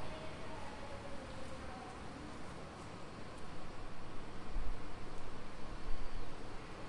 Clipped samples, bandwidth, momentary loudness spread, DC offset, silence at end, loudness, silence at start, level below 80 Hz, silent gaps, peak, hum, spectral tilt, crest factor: under 0.1%; 11 kHz; 3 LU; under 0.1%; 0 s; -49 LUFS; 0 s; -48 dBFS; none; -22 dBFS; none; -5 dB/octave; 16 dB